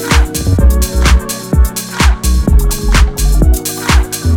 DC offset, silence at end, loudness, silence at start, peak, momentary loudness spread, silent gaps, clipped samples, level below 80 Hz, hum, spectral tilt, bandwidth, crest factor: under 0.1%; 0 s; -12 LUFS; 0 s; 0 dBFS; 3 LU; none; under 0.1%; -10 dBFS; none; -4.5 dB/octave; 18 kHz; 10 dB